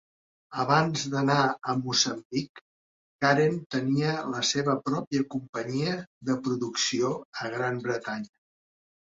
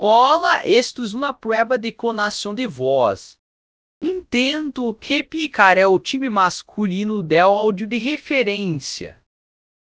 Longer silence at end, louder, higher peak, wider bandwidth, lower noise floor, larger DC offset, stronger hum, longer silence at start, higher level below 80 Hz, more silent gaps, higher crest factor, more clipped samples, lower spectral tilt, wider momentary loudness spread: about the same, 0.9 s vs 0.8 s; second, -28 LUFS vs -19 LUFS; second, -8 dBFS vs 0 dBFS; about the same, 7.8 kHz vs 8 kHz; about the same, under -90 dBFS vs under -90 dBFS; neither; neither; first, 0.5 s vs 0 s; second, -68 dBFS vs -58 dBFS; first, 2.25-2.30 s, 2.49-2.55 s, 2.61-3.19 s, 3.66-3.70 s, 5.07-5.11 s, 5.49-5.53 s, 6.07-6.21 s, 7.25-7.33 s vs 3.39-4.01 s; about the same, 20 dB vs 20 dB; neither; about the same, -4 dB/octave vs -4.5 dB/octave; about the same, 10 LU vs 12 LU